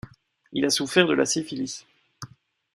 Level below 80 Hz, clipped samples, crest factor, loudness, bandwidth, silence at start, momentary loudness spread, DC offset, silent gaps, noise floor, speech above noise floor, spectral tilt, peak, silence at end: -62 dBFS; under 0.1%; 22 dB; -24 LUFS; 13.5 kHz; 0.05 s; 23 LU; under 0.1%; none; -52 dBFS; 28 dB; -3 dB/octave; -4 dBFS; 0.5 s